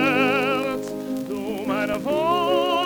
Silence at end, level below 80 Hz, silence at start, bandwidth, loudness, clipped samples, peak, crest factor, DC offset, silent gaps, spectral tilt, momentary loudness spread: 0 s; -56 dBFS; 0 s; 19.5 kHz; -23 LUFS; under 0.1%; -10 dBFS; 14 dB; under 0.1%; none; -5 dB/octave; 9 LU